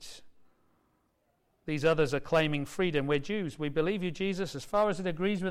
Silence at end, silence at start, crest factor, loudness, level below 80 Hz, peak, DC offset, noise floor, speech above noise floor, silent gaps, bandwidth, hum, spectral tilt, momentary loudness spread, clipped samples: 0 s; 0 s; 14 dB; -30 LUFS; -54 dBFS; -16 dBFS; under 0.1%; -74 dBFS; 44 dB; none; 15.5 kHz; none; -6 dB/octave; 7 LU; under 0.1%